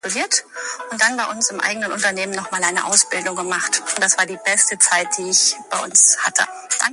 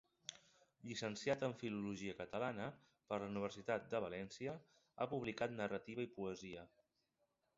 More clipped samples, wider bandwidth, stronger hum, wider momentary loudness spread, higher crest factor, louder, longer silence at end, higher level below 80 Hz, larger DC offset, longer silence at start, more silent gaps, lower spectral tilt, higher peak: neither; first, 12 kHz vs 7.6 kHz; neither; second, 9 LU vs 12 LU; about the same, 20 dB vs 20 dB; first, -16 LUFS vs -46 LUFS; second, 0 s vs 0.9 s; first, -70 dBFS vs -76 dBFS; neither; second, 0.05 s vs 0.3 s; neither; second, 0.5 dB/octave vs -4.5 dB/octave; first, 0 dBFS vs -26 dBFS